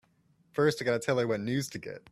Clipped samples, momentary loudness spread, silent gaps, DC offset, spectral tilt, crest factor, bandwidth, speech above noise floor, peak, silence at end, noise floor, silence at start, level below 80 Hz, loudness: under 0.1%; 11 LU; none; under 0.1%; -5.5 dB/octave; 18 dB; 15 kHz; 38 dB; -12 dBFS; 0.15 s; -68 dBFS; 0.55 s; -66 dBFS; -30 LUFS